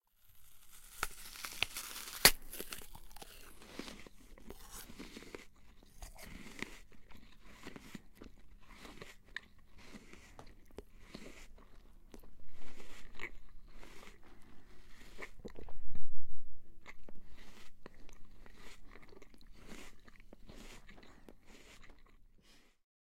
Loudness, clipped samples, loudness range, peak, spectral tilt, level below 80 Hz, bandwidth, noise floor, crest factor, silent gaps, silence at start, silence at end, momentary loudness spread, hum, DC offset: -39 LUFS; under 0.1%; 23 LU; -4 dBFS; -1.5 dB/octave; -54 dBFS; 16 kHz; -63 dBFS; 30 dB; none; 0.4 s; 1.9 s; 18 LU; none; under 0.1%